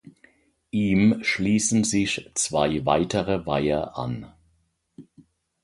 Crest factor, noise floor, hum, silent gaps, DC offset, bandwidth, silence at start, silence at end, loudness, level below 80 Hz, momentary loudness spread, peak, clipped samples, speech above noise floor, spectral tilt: 20 dB; -68 dBFS; none; none; under 0.1%; 11.5 kHz; 0.75 s; 0.6 s; -23 LUFS; -50 dBFS; 11 LU; -6 dBFS; under 0.1%; 45 dB; -4.5 dB/octave